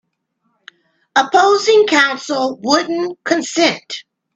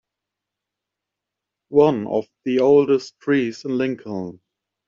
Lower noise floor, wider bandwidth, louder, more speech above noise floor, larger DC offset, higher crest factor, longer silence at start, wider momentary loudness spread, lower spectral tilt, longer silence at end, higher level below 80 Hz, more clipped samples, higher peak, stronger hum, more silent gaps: second, -68 dBFS vs -84 dBFS; first, 8.6 kHz vs 7.4 kHz; first, -14 LUFS vs -20 LUFS; second, 53 dB vs 65 dB; neither; about the same, 16 dB vs 18 dB; second, 1.15 s vs 1.7 s; second, 10 LU vs 13 LU; second, -2 dB/octave vs -6 dB/octave; second, 0.35 s vs 0.55 s; about the same, -66 dBFS vs -62 dBFS; neither; about the same, 0 dBFS vs -2 dBFS; neither; neither